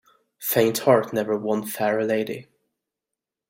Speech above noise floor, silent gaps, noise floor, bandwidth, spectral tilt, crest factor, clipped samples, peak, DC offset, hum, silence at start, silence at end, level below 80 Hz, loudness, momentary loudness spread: 65 dB; none; -87 dBFS; 16.5 kHz; -5 dB/octave; 20 dB; under 0.1%; -4 dBFS; under 0.1%; none; 0.4 s; 1.05 s; -66 dBFS; -23 LUFS; 11 LU